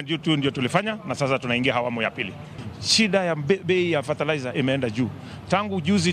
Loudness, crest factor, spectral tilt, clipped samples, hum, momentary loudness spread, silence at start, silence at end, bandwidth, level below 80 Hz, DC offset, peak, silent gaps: -23 LUFS; 20 dB; -4.5 dB/octave; under 0.1%; none; 9 LU; 0 s; 0 s; 14 kHz; -58 dBFS; under 0.1%; -4 dBFS; none